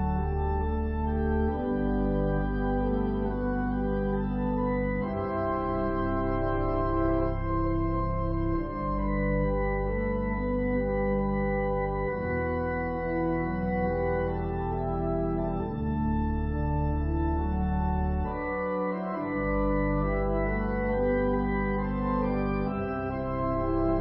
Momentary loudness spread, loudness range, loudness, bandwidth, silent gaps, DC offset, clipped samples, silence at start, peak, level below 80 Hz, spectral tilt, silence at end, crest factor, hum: 3 LU; 1 LU; -29 LUFS; 5.6 kHz; none; under 0.1%; under 0.1%; 0 s; -14 dBFS; -34 dBFS; -12.5 dB/octave; 0 s; 14 dB; none